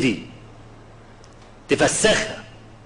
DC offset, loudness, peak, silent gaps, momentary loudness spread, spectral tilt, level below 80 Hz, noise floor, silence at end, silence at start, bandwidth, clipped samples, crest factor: under 0.1%; -20 LUFS; -6 dBFS; none; 23 LU; -3 dB/octave; -46 dBFS; -45 dBFS; 0.25 s; 0 s; 12.5 kHz; under 0.1%; 18 dB